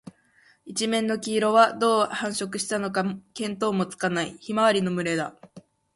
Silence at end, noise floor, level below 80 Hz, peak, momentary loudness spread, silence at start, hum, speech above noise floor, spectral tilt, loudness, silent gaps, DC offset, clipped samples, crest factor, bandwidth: 0.35 s; -60 dBFS; -68 dBFS; -4 dBFS; 10 LU; 0.05 s; none; 36 dB; -4 dB/octave; -25 LUFS; none; under 0.1%; under 0.1%; 20 dB; 11.5 kHz